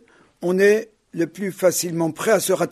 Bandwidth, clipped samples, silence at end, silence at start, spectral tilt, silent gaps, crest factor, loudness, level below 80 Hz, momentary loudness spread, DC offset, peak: 13.5 kHz; under 0.1%; 0 s; 0.4 s; -4.5 dB/octave; none; 16 dB; -20 LUFS; -68 dBFS; 10 LU; under 0.1%; -4 dBFS